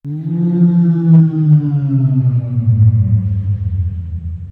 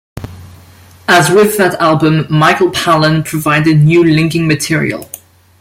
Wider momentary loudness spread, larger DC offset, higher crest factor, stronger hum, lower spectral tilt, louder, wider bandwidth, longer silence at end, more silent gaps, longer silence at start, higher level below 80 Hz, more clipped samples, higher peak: second, 11 LU vs 18 LU; neither; about the same, 10 dB vs 12 dB; neither; first, -13 dB/octave vs -5.5 dB/octave; second, -13 LUFS vs -10 LUFS; second, 2 kHz vs 16.5 kHz; second, 0 s vs 0.45 s; neither; about the same, 0.05 s vs 0.15 s; first, -34 dBFS vs -44 dBFS; neither; about the same, -2 dBFS vs 0 dBFS